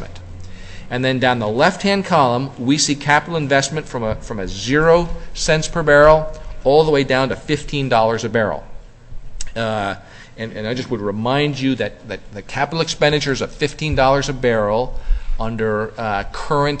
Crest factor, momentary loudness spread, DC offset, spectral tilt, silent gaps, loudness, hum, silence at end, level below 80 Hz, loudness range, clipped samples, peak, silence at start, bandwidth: 18 dB; 14 LU; under 0.1%; -4.5 dB/octave; none; -18 LUFS; none; 0 s; -30 dBFS; 7 LU; under 0.1%; 0 dBFS; 0 s; 8.6 kHz